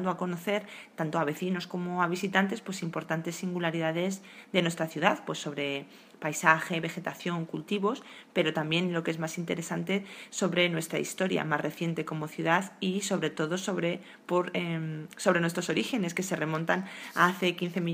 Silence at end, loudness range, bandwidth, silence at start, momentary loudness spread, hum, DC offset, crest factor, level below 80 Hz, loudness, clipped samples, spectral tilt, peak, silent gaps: 0 s; 2 LU; 15.5 kHz; 0 s; 9 LU; none; under 0.1%; 26 dB; -76 dBFS; -30 LUFS; under 0.1%; -4.5 dB/octave; -6 dBFS; none